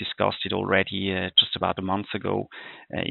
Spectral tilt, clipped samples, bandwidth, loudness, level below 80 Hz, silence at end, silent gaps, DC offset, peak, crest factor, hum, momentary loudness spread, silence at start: -2 dB/octave; under 0.1%; 4.6 kHz; -24 LUFS; -60 dBFS; 0 s; none; under 0.1%; -4 dBFS; 22 dB; none; 13 LU; 0 s